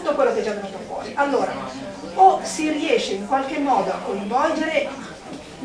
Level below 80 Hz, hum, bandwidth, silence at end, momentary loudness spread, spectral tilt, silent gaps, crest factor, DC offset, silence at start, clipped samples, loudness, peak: -54 dBFS; none; 11 kHz; 0 s; 16 LU; -4 dB/octave; none; 20 dB; under 0.1%; 0 s; under 0.1%; -21 LUFS; -2 dBFS